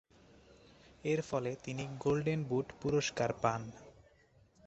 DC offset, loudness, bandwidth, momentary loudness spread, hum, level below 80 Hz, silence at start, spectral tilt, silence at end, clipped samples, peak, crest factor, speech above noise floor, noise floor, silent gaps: under 0.1%; -36 LUFS; 8.2 kHz; 9 LU; none; -66 dBFS; 1.05 s; -5.5 dB/octave; 0.75 s; under 0.1%; -16 dBFS; 22 dB; 31 dB; -67 dBFS; none